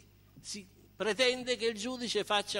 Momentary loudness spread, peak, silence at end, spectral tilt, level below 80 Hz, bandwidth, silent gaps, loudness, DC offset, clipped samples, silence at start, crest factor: 14 LU; -16 dBFS; 0 s; -2 dB/octave; -68 dBFS; 16 kHz; none; -32 LUFS; under 0.1%; under 0.1%; 0.35 s; 18 dB